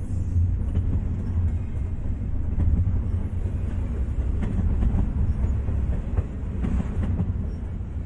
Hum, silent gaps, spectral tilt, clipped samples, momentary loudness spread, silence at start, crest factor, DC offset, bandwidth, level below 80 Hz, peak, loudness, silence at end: none; none; -10 dB/octave; under 0.1%; 6 LU; 0 s; 14 dB; under 0.1%; 3.5 kHz; -28 dBFS; -10 dBFS; -27 LUFS; 0 s